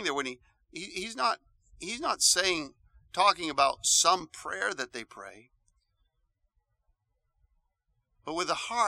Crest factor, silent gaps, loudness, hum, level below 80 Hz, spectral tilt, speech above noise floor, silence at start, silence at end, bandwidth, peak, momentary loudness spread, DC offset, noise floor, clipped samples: 24 dB; none; -28 LUFS; none; -66 dBFS; 0 dB/octave; 48 dB; 0 s; 0 s; 16.5 kHz; -8 dBFS; 21 LU; under 0.1%; -78 dBFS; under 0.1%